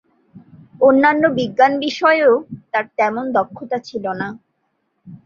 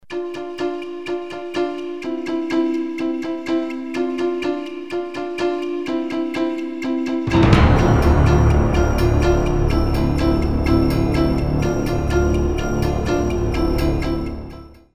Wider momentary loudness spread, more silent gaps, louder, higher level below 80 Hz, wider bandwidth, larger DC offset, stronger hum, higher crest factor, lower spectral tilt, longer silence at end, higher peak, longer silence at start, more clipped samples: about the same, 12 LU vs 12 LU; neither; first, -17 LUFS vs -20 LUFS; second, -62 dBFS vs -24 dBFS; second, 7.2 kHz vs 13.5 kHz; second, under 0.1% vs 0.7%; neither; about the same, 16 dB vs 18 dB; second, -5.5 dB/octave vs -7.5 dB/octave; about the same, 0.1 s vs 0.1 s; about the same, -2 dBFS vs 0 dBFS; first, 0.35 s vs 0.1 s; neither